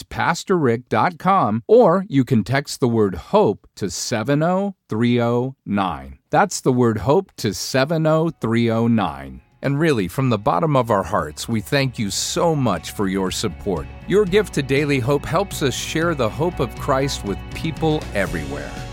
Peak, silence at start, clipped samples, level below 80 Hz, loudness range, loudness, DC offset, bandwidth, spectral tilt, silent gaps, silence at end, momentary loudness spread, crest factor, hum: -4 dBFS; 0 s; under 0.1%; -40 dBFS; 3 LU; -20 LUFS; under 0.1%; 17 kHz; -5.5 dB/octave; none; 0 s; 8 LU; 16 dB; none